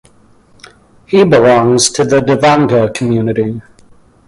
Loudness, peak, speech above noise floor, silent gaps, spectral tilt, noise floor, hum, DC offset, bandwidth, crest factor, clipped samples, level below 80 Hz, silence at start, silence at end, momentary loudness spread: -10 LUFS; 0 dBFS; 36 dB; none; -5 dB/octave; -46 dBFS; none; under 0.1%; 11.5 kHz; 12 dB; under 0.1%; -46 dBFS; 1.1 s; 0.7 s; 8 LU